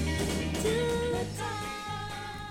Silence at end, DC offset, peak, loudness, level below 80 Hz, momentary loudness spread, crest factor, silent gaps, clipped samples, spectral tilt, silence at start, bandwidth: 0 s; under 0.1%; -16 dBFS; -32 LUFS; -42 dBFS; 8 LU; 14 dB; none; under 0.1%; -4.5 dB/octave; 0 s; 17 kHz